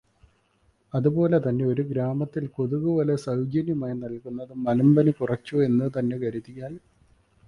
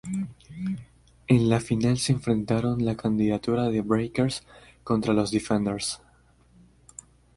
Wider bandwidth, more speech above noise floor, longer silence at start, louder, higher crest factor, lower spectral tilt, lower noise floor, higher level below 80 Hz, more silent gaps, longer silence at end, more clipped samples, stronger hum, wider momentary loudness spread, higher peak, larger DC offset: about the same, 11 kHz vs 11.5 kHz; first, 41 dB vs 35 dB; first, 0.95 s vs 0.05 s; about the same, -25 LUFS vs -26 LUFS; about the same, 18 dB vs 20 dB; first, -9.5 dB/octave vs -6 dB/octave; first, -65 dBFS vs -59 dBFS; second, -60 dBFS vs -52 dBFS; neither; second, 0.7 s vs 1.4 s; neither; second, none vs 60 Hz at -45 dBFS; about the same, 15 LU vs 15 LU; about the same, -8 dBFS vs -6 dBFS; neither